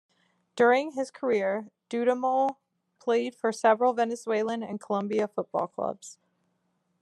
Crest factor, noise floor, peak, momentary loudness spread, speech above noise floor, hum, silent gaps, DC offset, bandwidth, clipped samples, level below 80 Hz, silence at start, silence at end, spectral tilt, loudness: 18 dB; -75 dBFS; -10 dBFS; 12 LU; 48 dB; none; none; under 0.1%; 12 kHz; under 0.1%; -86 dBFS; 0.55 s; 0.9 s; -5 dB/octave; -28 LUFS